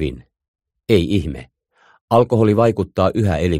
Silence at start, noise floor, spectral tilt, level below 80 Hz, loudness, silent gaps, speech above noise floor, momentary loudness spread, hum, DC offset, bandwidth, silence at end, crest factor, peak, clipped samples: 0 s; -56 dBFS; -7.5 dB/octave; -38 dBFS; -17 LUFS; 0.48-0.54 s, 2.01-2.08 s; 40 dB; 14 LU; none; under 0.1%; 15 kHz; 0 s; 16 dB; -2 dBFS; under 0.1%